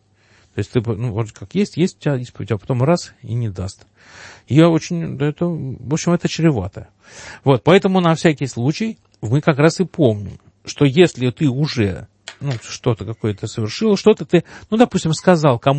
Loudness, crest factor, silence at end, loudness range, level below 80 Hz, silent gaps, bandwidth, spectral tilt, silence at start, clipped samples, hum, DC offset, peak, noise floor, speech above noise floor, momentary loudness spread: -18 LUFS; 18 dB; 0 s; 4 LU; -50 dBFS; none; 8.8 kHz; -6.5 dB/octave; 0.55 s; under 0.1%; none; under 0.1%; 0 dBFS; -54 dBFS; 37 dB; 14 LU